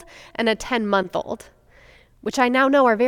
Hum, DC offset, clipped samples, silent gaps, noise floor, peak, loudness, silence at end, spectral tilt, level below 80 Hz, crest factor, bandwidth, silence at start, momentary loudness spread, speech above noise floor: none; under 0.1%; under 0.1%; none; -51 dBFS; -4 dBFS; -20 LUFS; 0 s; -4.5 dB/octave; -52 dBFS; 18 dB; 17 kHz; 0.2 s; 17 LU; 31 dB